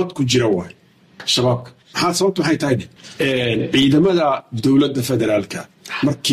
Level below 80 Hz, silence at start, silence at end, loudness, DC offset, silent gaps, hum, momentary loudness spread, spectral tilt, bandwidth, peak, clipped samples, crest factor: -50 dBFS; 0 s; 0 s; -18 LUFS; under 0.1%; none; none; 12 LU; -5 dB/octave; 15.5 kHz; -4 dBFS; under 0.1%; 14 dB